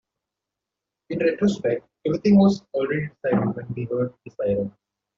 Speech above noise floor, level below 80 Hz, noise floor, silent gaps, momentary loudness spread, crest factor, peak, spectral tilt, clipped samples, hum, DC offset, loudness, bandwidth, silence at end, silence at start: 64 dB; -56 dBFS; -86 dBFS; none; 12 LU; 16 dB; -8 dBFS; -7.5 dB/octave; under 0.1%; none; under 0.1%; -23 LUFS; 7.4 kHz; 0.5 s; 1.1 s